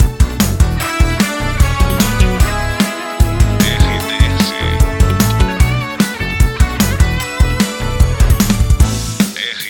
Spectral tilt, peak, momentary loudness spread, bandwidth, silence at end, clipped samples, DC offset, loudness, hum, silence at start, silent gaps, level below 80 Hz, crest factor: -5 dB/octave; 0 dBFS; 4 LU; 17.5 kHz; 0 s; under 0.1%; under 0.1%; -14 LUFS; none; 0 s; none; -16 dBFS; 12 dB